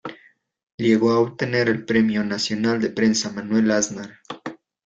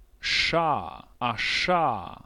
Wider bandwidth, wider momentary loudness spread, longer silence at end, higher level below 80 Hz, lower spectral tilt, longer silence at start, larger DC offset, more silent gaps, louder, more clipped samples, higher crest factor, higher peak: second, 7.8 kHz vs 13 kHz; first, 16 LU vs 8 LU; first, 0.3 s vs 0.1 s; second, -60 dBFS vs -52 dBFS; about the same, -4.5 dB/octave vs -3.5 dB/octave; second, 0.05 s vs 0.2 s; neither; first, 0.63-0.67 s, 0.74-0.78 s vs none; first, -21 LUFS vs -25 LUFS; neither; about the same, 16 dB vs 16 dB; first, -4 dBFS vs -10 dBFS